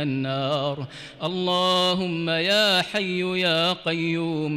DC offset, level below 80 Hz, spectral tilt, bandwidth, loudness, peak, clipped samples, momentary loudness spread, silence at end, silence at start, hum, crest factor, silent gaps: under 0.1%; -62 dBFS; -4.5 dB/octave; 16 kHz; -22 LUFS; -12 dBFS; under 0.1%; 10 LU; 0 s; 0 s; none; 12 dB; none